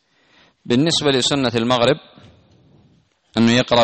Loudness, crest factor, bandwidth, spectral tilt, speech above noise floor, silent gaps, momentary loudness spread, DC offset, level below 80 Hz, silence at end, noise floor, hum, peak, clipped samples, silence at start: -17 LUFS; 14 dB; 8.8 kHz; -4.5 dB/octave; 41 dB; none; 5 LU; under 0.1%; -52 dBFS; 0 s; -57 dBFS; none; -4 dBFS; under 0.1%; 0.65 s